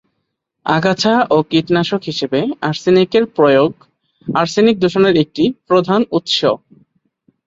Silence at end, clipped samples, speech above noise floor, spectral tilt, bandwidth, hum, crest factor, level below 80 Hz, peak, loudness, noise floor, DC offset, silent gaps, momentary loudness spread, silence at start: 0.9 s; under 0.1%; 58 dB; -5.5 dB/octave; 7.8 kHz; none; 14 dB; -56 dBFS; -2 dBFS; -15 LUFS; -72 dBFS; under 0.1%; none; 7 LU; 0.65 s